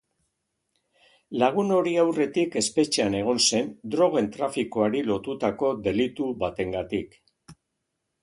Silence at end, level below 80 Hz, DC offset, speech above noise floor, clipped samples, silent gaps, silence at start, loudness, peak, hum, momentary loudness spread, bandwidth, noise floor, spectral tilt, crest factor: 0.7 s; -58 dBFS; under 0.1%; 55 dB; under 0.1%; none; 1.3 s; -25 LUFS; -6 dBFS; none; 8 LU; 11.5 kHz; -80 dBFS; -4 dB/octave; 20 dB